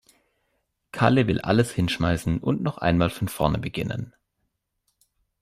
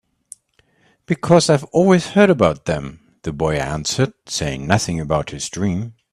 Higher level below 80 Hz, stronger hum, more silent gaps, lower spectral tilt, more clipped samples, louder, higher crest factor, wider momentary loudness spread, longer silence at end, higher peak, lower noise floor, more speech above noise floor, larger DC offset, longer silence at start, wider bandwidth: about the same, -46 dBFS vs -44 dBFS; neither; neither; about the same, -6.5 dB/octave vs -5.5 dB/octave; neither; second, -24 LUFS vs -18 LUFS; about the same, 20 dB vs 18 dB; about the same, 10 LU vs 12 LU; first, 1.35 s vs 0.2 s; second, -6 dBFS vs 0 dBFS; first, -77 dBFS vs -60 dBFS; first, 54 dB vs 43 dB; neither; second, 0.95 s vs 1.1 s; first, 15.5 kHz vs 13.5 kHz